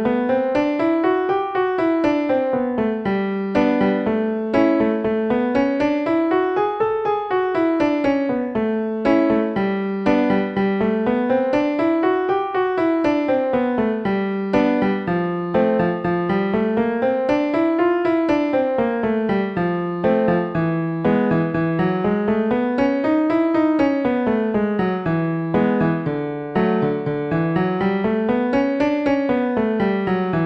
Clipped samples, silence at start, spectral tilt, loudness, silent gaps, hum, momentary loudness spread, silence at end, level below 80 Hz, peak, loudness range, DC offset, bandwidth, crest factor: under 0.1%; 0 s; -8.5 dB/octave; -20 LUFS; none; none; 4 LU; 0 s; -50 dBFS; -4 dBFS; 1 LU; under 0.1%; 6.2 kHz; 14 dB